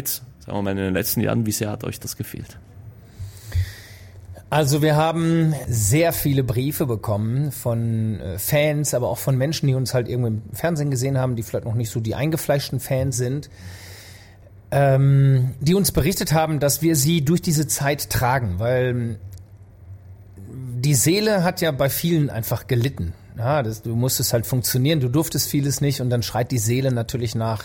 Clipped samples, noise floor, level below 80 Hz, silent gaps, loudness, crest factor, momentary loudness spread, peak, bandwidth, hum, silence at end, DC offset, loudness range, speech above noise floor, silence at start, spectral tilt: under 0.1%; -45 dBFS; -44 dBFS; none; -21 LUFS; 14 dB; 12 LU; -6 dBFS; 17 kHz; none; 0 s; under 0.1%; 6 LU; 25 dB; 0 s; -5.5 dB/octave